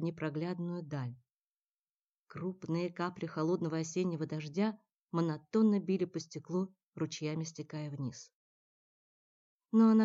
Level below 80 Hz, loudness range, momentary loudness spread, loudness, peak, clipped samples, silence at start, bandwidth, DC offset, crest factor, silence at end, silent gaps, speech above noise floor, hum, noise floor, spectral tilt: -80 dBFS; 6 LU; 13 LU; -36 LUFS; -16 dBFS; under 0.1%; 0 s; 7.8 kHz; under 0.1%; 18 dB; 0 s; 1.43-2.26 s, 4.95-5.08 s, 6.83-6.91 s, 8.33-9.60 s; over 56 dB; none; under -90 dBFS; -7 dB/octave